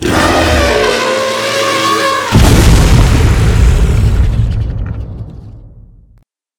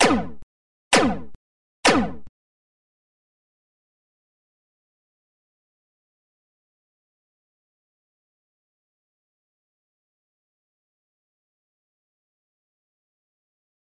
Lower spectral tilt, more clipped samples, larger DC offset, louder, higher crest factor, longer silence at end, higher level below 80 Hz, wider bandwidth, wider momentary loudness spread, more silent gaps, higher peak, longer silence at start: first, -5 dB/octave vs -3 dB/octave; first, 0.5% vs under 0.1%; second, under 0.1% vs 2%; first, -10 LUFS vs -21 LUFS; second, 10 dB vs 26 dB; second, 0.9 s vs 11.7 s; first, -14 dBFS vs -52 dBFS; first, 18.5 kHz vs 11.5 kHz; about the same, 13 LU vs 14 LU; second, none vs 0.43-0.91 s, 1.35-1.83 s; first, 0 dBFS vs -4 dBFS; about the same, 0 s vs 0 s